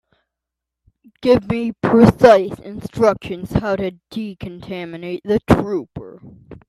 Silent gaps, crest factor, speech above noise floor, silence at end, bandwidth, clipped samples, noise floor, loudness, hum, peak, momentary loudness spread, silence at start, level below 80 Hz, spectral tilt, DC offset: none; 18 dB; 67 dB; 0.15 s; 13 kHz; under 0.1%; -83 dBFS; -17 LUFS; none; 0 dBFS; 18 LU; 1.25 s; -42 dBFS; -7.5 dB/octave; under 0.1%